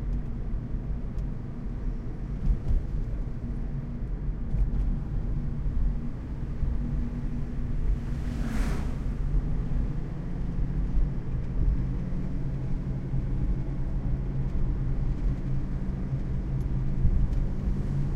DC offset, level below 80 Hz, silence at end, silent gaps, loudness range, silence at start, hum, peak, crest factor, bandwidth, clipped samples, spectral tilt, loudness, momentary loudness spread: under 0.1%; -30 dBFS; 0 s; none; 3 LU; 0 s; none; -12 dBFS; 16 dB; 6.8 kHz; under 0.1%; -9 dB/octave; -32 LUFS; 5 LU